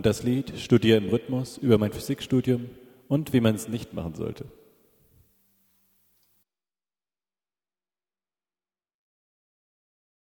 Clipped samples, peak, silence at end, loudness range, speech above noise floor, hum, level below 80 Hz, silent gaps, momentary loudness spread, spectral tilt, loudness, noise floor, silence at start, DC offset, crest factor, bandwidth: under 0.1%; -6 dBFS; 5.75 s; 16 LU; over 65 dB; none; -56 dBFS; none; 13 LU; -6.5 dB/octave; -25 LUFS; under -90 dBFS; 0 s; under 0.1%; 22 dB; 18 kHz